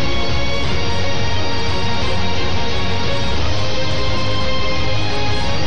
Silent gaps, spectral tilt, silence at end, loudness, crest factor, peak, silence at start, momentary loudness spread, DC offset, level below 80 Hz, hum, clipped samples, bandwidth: none; -5 dB/octave; 0 s; -20 LUFS; 8 dB; -6 dBFS; 0 s; 1 LU; 20%; -28 dBFS; none; under 0.1%; 9.6 kHz